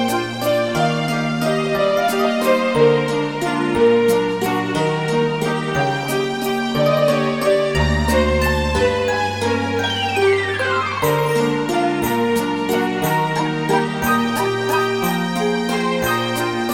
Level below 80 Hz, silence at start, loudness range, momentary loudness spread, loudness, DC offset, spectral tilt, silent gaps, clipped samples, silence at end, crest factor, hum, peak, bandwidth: -34 dBFS; 0 s; 2 LU; 4 LU; -18 LUFS; 0.2%; -5 dB/octave; none; under 0.1%; 0 s; 16 dB; none; -2 dBFS; 19 kHz